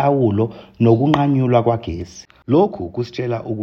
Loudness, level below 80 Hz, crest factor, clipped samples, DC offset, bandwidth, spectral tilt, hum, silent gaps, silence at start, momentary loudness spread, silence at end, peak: -18 LUFS; -46 dBFS; 16 dB; under 0.1%; under 0.1%; 6.8 kHz; -8.5 dB/octave; none; none; 0 s; 13 LU; 0 s; 0 dBFS